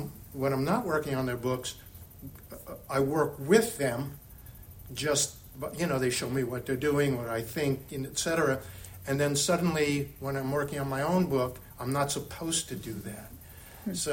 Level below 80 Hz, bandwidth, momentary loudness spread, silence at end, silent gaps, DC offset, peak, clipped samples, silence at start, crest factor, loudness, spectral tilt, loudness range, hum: -54 dBFS; 17 kHz; 19 LU; 0 s; none; under 0.1%; -8 dBFS; under 0.1%; 0 s; 22 dB; -30 LUFS; -4.5 dB/octave; 2 LU; none